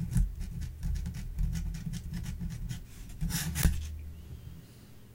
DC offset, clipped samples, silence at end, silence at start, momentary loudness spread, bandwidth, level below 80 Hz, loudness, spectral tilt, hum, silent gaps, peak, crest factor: under 0.1%; under 0.1%; 0 s; 0 s; 17 LU; 16.5 kHz; -36 dBFS; -36 LUFS; -4.5 dB/octave; none; none; -8 dBFS; 26 dB